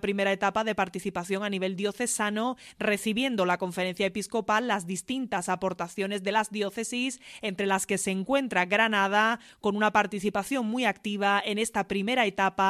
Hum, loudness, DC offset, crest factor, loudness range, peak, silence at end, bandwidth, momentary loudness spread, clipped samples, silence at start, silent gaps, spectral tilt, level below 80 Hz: none; -28 LUFS; under 0.1%; 20 dB; 3 LU; -8 dBFS; 0 s; 15 kHz; 7 LU; under 0.1%; 0.05 s; none; -3.5 dB/octave; -64 dBFS